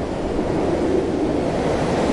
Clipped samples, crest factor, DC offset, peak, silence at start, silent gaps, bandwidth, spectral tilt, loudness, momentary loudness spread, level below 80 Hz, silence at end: under 0.1%; 14 dB; under 0.1%; -8 dBFS; 0 s; none; 11.5 kHz; -6.5 dB/octave; -21 LUFS; 3 LU; -36 dBFS; 0 s